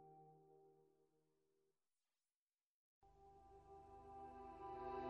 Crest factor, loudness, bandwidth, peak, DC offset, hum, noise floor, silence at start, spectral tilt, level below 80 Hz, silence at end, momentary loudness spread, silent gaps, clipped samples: 20 dB; -59 LUFS; 8.2 kHz; -38 dBFS; under 0.1%; none; under -90 dBFS; 0 s; -7 dB/octave; -76 dBFS; 0 s; 15 LU; 2.36-2.47 s, 2.63-3.01 s; under 0.1%